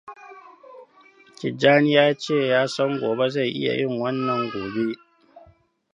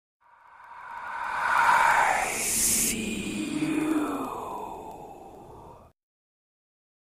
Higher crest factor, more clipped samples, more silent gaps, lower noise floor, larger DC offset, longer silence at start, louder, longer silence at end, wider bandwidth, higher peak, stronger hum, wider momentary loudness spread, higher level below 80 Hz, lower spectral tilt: about the same, 22 dB vs 20 dB; neither; neither; first, -56 dBFS vs -52 dBFS; neither; second, 0.05 s vs 0.6 s; first, -22 LUFS vs -25 LUFS; second, 0.55 s vs 1.25 s; second, 10 kHz vs 15.5 kHz; first, -2 dBFS vs -10 dBFS; neither; second, 14 LU vs 23 LU; second, -66 dBFS vs -54 dBFS; first, -5.5 dB/octave vs -2 dB/octave